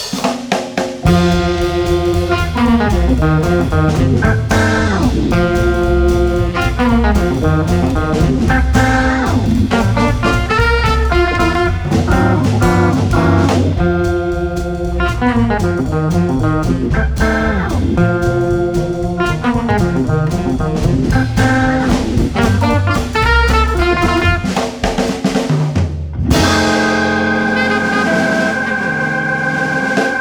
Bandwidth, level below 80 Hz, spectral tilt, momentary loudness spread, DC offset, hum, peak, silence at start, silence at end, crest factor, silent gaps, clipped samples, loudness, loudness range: over 20 kHz; -22 dBFS; -6 dB/octave; 4 LU; under 0.1%; none; 0 dBFS; 0 s; 0 s; 12 dB; none; under 0.1%; -14 LUFS; 2 LU